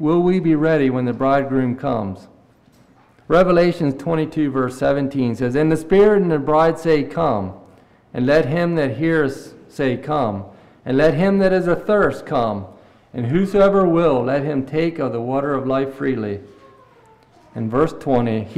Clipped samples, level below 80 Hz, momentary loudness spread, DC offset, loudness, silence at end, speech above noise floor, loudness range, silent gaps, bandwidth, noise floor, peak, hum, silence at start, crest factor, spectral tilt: under 0.1%; -44 dBFS; 10 LU; under 0.1%; -18 LUFS; 0 s; 35 dB; 4 LU; none; 13 kHz; -52 dBFS; -6 dBFS; none; 0 s; 12 dB; -8 dB/octave